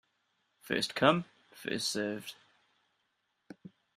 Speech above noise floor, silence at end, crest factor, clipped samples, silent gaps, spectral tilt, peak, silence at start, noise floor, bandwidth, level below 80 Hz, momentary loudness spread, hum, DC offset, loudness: 48 dB; 0.3 s; 26 dB; under 0.1%; none; -4 dB/octave; -10 dBFS; 0.65 s; -80 dBFS; 15.5 kHz; -72 dBFS; 25 LU; none; under 0.1%; -32 LUFS